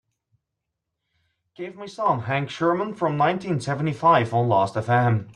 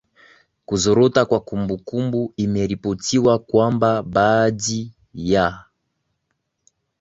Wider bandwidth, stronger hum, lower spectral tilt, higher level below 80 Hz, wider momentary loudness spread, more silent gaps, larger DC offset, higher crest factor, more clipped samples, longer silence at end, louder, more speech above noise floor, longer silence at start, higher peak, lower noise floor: first, 10.5 kHz vs 8 kHz; neither; first, -7 dB/octave vs -5.5 dB/octave; second, -62 dBFS vs -48 dBFS; about the same, 11 LU vs 9 LU; neither; neither; about the same, 18 dB vs 20 dB; neither; second, 0.05 s vs 1.4 s; second, -22 LUFS vs -19 LUFS; first, 60 dB vs 56 dB; first, 1.6 s vs 0.7 s; second, -6 dBFS vs -2 dBFS; first, -82 dBFS vs -74 dBFS